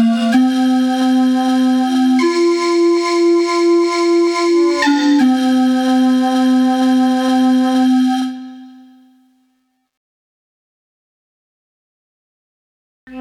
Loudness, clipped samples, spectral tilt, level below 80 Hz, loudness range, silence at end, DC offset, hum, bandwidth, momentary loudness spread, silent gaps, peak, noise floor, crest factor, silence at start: -13 LUFS; under 0.1%; -4 dB/octave; -64 dBFS; 5 LU; 0 s; under 0.1%; none; 12 kHz; 1 LU; 9.97-13.07 s; -6 dBFS; -64 dBFS; 8 dB; 0 s